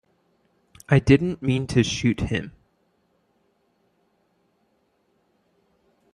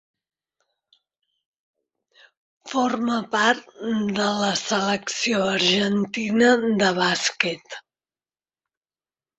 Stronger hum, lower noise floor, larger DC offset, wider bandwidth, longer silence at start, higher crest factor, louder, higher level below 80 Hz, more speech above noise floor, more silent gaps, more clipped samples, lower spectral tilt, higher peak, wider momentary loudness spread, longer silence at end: neither; second, -68 dBFS vs under -90 dBFS; neither; first, 11 kHz vs 8.2 kHz; second, 0.9 s vs 2.65 s; about the same, 22 dB vs 22 dB; about the same, -22 LUFS vs -21 LUFS; first, -46 dBFS vs -66 dBFS; second, 47 dB vs over 68 dB; neither; neither; first, -6.5 dB/octave vs -3.5 dB/octave; about the same, -4 dBFS vs -2 dBFS; first, 11 LU vs 8 LU; first, 3.65 s vs 1.6 s